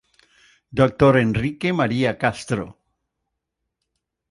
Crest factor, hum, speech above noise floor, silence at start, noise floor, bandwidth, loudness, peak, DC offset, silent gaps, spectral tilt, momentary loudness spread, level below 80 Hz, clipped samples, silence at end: 20 dB; none; 61 dB; 0.75 s; -80 dBFS; 11.5 kHz; -20 LUFS; -2 dBFS; under 0.1%; none; -7 dB/octave; 12 LU; -48 dBFS; under 0.1%; 1.6 s